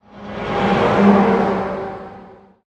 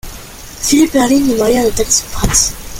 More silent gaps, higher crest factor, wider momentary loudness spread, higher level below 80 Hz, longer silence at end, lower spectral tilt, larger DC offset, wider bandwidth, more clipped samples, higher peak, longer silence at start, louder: neither; about the same, 16 dB vs 14 dB; first, 20 LU vs 17 LU; second, -44 dBFS vs -28 dBFS; first, 0.35 s vs 0 s; first, -7.5 dB/octave vs -3 dB/octave; neither; second, 8 kHz vs 17 kHz; neither; about the same, -2 dBFS vs 0 dBFS; about the same, 0.15 s vs 0.05 s; second, -16 LUFS vs -12 LUFS